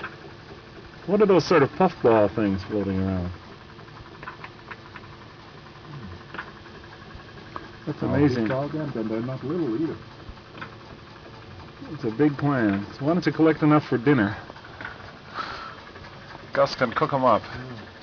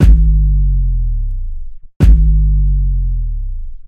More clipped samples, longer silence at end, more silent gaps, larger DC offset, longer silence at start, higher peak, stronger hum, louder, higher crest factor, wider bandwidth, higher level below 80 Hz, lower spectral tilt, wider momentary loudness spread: neither; about the same, 0 s vs 0.05 s; second, none vs 1.96-2.00 s; neither; about the same, 0 s vs 0 s; second, -8 dBFS vs 0 dBFS; neither; second, -23 LUFS vs -15 LUFS; first, 18 dB vs 12 dB; first, 5.4 kHz vs 3 kHz; second, -54 dBFS vs -12 dBFS; second, -7.5 dB/octave vs -9 dB/octave; first, 23 LU vs 16 LU